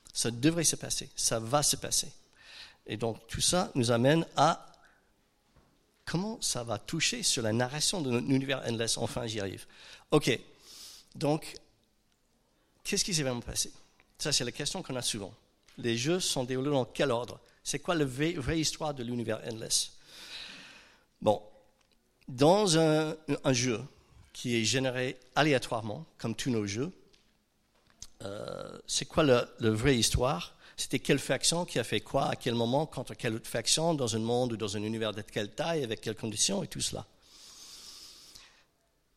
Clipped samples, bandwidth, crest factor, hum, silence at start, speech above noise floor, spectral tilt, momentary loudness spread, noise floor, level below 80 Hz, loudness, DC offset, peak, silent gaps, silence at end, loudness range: under 0.1%; 16 kHz; 22 dB; none; 0.15 s; 42 dB; -3.5 dB/octave; 18 LU; -72 dBFS; -54 dBFS; -30 LUFS; under 0.1%; -10 dBFS; none; 0.7 s; 5 LU